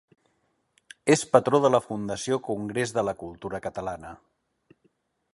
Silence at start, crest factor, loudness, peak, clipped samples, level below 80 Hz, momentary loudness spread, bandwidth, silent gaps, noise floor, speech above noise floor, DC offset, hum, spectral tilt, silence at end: 1.05 s; 26 dB; -26 LUFS; -2 dBFS; under 0.1%; -60 dBFS; 15 LU; 11.5 kHz; none; -72 dBFS; 47 dB; under 0.1%; none; -5 dB/octave; 1.2 s